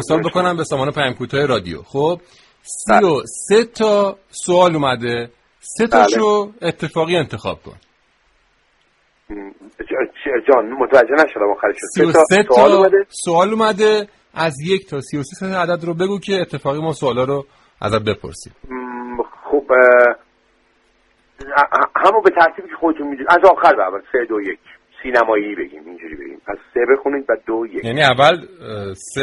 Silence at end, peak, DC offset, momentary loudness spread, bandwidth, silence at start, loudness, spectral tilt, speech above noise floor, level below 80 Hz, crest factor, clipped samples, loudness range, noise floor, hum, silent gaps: 0 s; 0 dBFS; under 0.1%; 18 LU; 11.5 kHz; 0 s; -16 LUFS; -4.5 dB/octave; 44 dB; -50 dBFS; 16 dB; under 0.1%; 8 LU; -60 dBFS; none; none